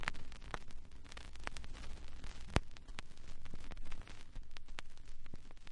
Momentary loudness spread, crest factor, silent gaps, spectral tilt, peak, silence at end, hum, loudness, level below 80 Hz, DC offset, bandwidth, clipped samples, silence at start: 17 LU; 28 dB; none; -4.5 dB/octave; -12 dBFS; 0 s; none; -50 LUFS; -48 dBFS; under 0.1%; 11 kHz; under 0.1%; 0 s